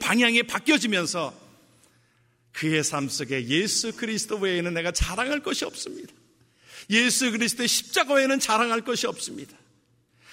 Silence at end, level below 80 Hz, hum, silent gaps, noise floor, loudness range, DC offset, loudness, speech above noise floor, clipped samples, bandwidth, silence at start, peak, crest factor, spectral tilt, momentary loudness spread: 0 s; -44 dBFS; none; none; -64 dBFS; 4 LU; under 0.1%; -24 LUFS; 39 dB; under 0.1%; 16 kHz; 0 s; -6 dBFS; 20 dB; -2.5 dB/octave; 14 LU